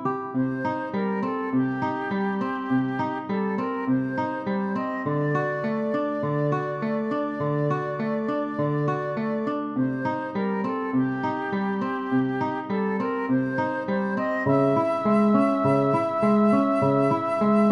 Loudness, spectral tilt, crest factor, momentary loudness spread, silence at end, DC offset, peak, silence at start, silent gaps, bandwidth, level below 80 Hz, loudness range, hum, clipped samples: -25 LUFS; -9 dB/octave; 16 dB; 6 LU; 0 s; under 0.1%; -8 dBFS; 0 s; none; 10 kHz; -66 dBFS; 5 LU; none; under 0.1%